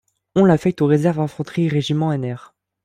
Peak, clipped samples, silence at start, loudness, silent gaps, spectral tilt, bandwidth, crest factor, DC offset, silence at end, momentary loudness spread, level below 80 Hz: -4 dBFS; under 0.1%; 0.35 s; -19 LUFS; none; -8 dB/octave; 10.5 kHz; 16 dB; under 0.1%; 0.45 s; 9 LU; -54 dBFS